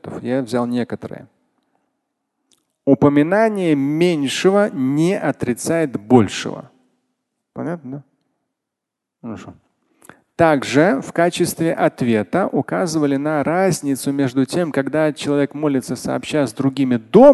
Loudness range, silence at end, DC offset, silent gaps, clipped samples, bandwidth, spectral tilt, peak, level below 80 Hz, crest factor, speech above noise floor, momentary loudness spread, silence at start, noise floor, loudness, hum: 7 LU; 0 s; under 0.1%; none; under 0.1%; 12.5 kHz; -6 dB/octave; 0 dBFS; -54 dBFS; 18 dB; 65 dB; 15 LU; 0.05 s; -82 dBFS; -18 LUFS; none